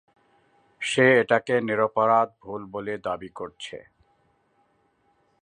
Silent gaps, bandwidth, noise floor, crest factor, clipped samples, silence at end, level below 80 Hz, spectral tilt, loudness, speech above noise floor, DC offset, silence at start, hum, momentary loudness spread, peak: none; 9.8 kHz; -67 dBFS; 22 dB; under 0.1%; 1.6 s; -66 dBFS; -5 dB/octave; -23 LUFS; 43 dB; under 0.1%; 0.8 s; none; 19 LU; -4 dBFS